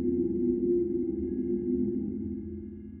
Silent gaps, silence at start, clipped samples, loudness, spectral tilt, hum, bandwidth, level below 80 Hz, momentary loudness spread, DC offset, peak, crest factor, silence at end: none; 0 s; under 0.1%; -30 LUFS; -13.5 dB/octave; none; 2.2 kHz; -50 dBFS; 11 LU; under 0.1%; -16 dBFS; 14 dB; 0 s